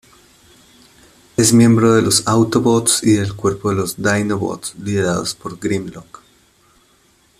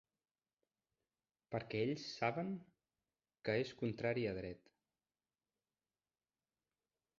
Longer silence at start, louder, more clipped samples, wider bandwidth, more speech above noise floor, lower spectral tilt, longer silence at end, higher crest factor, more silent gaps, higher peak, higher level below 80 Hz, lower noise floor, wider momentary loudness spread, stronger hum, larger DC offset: about the same, 1.4 s vs 1.5 s; first, -16 LUFS vs -42 LUFS; neither; first, 14.5 kHz vs 7.2 kHz; second, 40 dB vs over 49 dB; about the same, -4.5 dB/octave vs -5 dB/octave; second, 1.35 s vs 2.6 s; about the same, 18 dB vs 22 dB; neither; first, 0 dBFS vs -22 dBFS; first, -50 dBFS vs -74 dBFS; second, -55 dBFS vs under -90 dBFS; first, 13 LU vs 9 LU; neither; neither